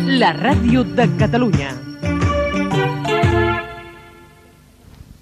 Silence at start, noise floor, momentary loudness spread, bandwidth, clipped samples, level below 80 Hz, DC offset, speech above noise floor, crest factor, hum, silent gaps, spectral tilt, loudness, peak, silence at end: 0 s; -47 dBFS; 11 LU; 13.5 kHz; under 0.1%; -34 dBFS; under 0.1%; 31 dB; 14 dB; none; none; -6.5 dB/octave; -17 LUFS; -4 dBFS; 1.1 s